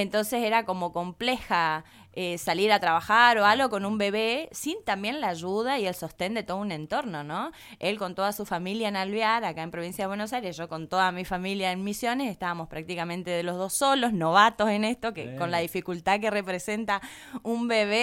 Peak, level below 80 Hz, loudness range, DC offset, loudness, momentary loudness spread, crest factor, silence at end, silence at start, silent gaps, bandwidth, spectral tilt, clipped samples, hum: -4 dBFS; -60 dBFS; 6 LU; under 0.1%; -27 LUFS; 11 LU; 22 dB; 0 s; 0 s; none; 17 kHz; -4 dB/octave; under 0.1%; none